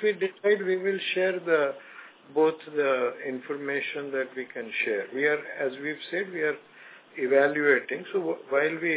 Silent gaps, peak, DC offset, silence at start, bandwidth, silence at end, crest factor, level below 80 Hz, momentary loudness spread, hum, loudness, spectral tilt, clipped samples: none; -8 dBFS; under 0.1%; 0 s; 4 kHz; 0 s; 20 dB; under -90 dBFS; 10 LU; none; -27 LUFS; -8 dB/octave; under 0.1%